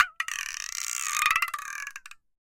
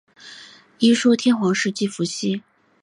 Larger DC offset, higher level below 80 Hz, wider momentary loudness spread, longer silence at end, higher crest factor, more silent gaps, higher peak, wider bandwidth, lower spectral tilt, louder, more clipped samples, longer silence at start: neither; first, -64 dBFS vs -70 dBFS; second, 13 LU vs 23 LU; second, 0.25 s vs 0.45 s; first, 26 dB vs 16 dB; neither; about the same, -4 dBFS vs -6 dBFS; first, 17 kHz vs 11 kHz; second, 4 dB/octave vs -4.5 dB/octave; second, -28 LUFS vs -20 LUFS; neither; second, 0 s vs 0.25 s